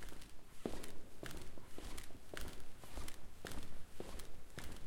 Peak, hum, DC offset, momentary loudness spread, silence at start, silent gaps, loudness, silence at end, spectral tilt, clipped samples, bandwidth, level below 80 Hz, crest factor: -26 dBFS; none; under 0.1%; 7 LU; 0 s; none; -53 LUFS; 0 s; -4 dB/octave; under 0.1%; 17 kHz; -52 dBFS; 16 dB